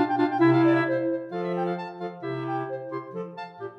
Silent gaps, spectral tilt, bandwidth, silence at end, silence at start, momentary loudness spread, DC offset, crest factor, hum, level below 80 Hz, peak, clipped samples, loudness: none; -9 dB/octave; 5.6 kHz; 0 s; 0 s; 15 LU; under 0.1%; 16 dB; none; -80 dBFS; -10 dBFS; under 0.1%; -26 LUFS